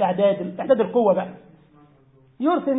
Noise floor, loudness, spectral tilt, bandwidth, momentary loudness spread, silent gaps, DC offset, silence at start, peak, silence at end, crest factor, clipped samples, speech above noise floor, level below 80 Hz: -55 dBFS; -21 LUFS; -11.5 dB/octave; 4 kHz; 8 LU; none; under 0.1%; 0 s; -6 dBFS; 0 s; 16 dB; under 0.1%; 35 dB; -68 dBFS